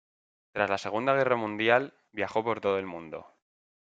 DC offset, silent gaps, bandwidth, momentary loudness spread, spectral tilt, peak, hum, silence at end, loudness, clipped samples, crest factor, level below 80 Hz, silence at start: under 0.1%; none; 8 kHz; 15 LU; -5.5 dB/octave; -6 dBFS; none; 0.7 s; -28 LUFS; under 0.1%; 24 dB; -72 dBFS; 0.55 s